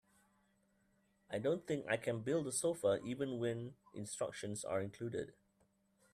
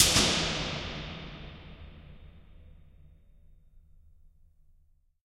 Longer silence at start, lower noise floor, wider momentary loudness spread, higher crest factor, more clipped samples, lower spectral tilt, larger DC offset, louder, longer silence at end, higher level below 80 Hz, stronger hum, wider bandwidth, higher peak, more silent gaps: first, 1.3 s vs 0 s; first, -77 dBFS vs -64 dBFS; second, 10 LU vs 27 LU; second, 20 dB vs 30 dB; neither; first, -5 dB/octave vs -2 dB/octave; neither; second, -40 LUFS vs -28 LUFS; second, 0.85 s vs 1.45 s; second, -76 dBFS vs -48 dBFS; neither; second, 14.5 kHz vs 16 kHz; second, -22 dBFS vs -4 dBFS; neither